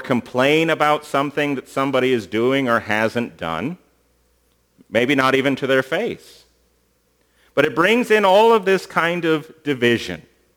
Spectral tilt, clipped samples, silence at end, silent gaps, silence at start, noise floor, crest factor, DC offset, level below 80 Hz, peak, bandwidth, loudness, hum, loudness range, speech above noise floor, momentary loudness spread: -5 dB/octave; under 0.1%; 0.35 s; none; 0 s; -63 dBFS; 18 dB; under 0.1%; -60 dBFS; 0 dBFS; over 20 kHz; -18 LUFS; none; 4 LU; 44 dB; 11 LU